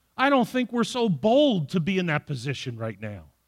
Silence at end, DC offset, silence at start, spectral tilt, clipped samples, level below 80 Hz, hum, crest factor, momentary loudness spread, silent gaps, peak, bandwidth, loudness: 0.25 s; under 0.1%; 0.2 s; -6 dB/octave; under 0.1%; -62 dBFS; none; 18 dB; 13 LU; none; -8 dBFS; 15.5 kHz; -24 LUFS